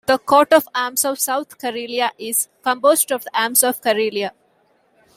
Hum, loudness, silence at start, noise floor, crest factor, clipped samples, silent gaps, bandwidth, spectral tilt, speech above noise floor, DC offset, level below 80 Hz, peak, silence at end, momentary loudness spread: none; -18 LUFS; 0.1 s; -60 dBFS; 20 dB; under 0.1%; none; 16 kHz; -1 dB/octave; 42 dB; under 0.1%; -66 dBFS; 0 dBFS; 0.85 s; 9 LU